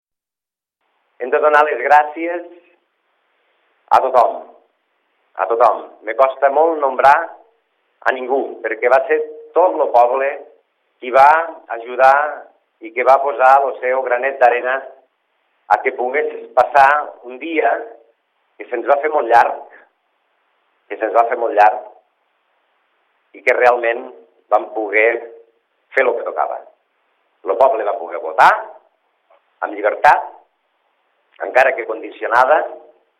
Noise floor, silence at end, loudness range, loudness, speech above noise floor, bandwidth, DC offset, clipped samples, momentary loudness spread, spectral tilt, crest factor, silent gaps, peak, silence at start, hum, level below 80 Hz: -89 dBFS; 0.4 s; 5 LU; -15 LUFS; 74 dB; 11.5 kHz; under 0.1%; under 0.1%; 15 LU; -4 dB/octave; 18 dB; none; 0 dBFS; 1.2 s; none; -64 dBFS